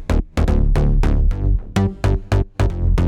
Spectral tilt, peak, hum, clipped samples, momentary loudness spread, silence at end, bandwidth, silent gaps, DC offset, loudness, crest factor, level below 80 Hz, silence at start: -7.5 dB/octave; -2 dBFS; none; under 0.1%; 3 LU; 0 s; 10.5 kHz; none; under 0.1%; -20 LUFS; 14 dB; -18 dBFS; 0 s